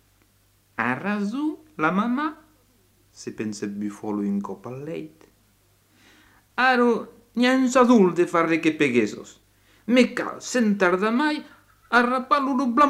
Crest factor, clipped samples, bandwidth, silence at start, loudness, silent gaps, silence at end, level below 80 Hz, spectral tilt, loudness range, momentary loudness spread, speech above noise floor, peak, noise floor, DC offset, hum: 18 dB; under 0.1%; 12.5 kHz; 0.8 s; -22 LUFS; none; 0 s; -64 dBFS; -5 dB/octave; 12 LU; 16 LU; 40 dB; -4 dBFS; -62 dBFS; under 0.1%; none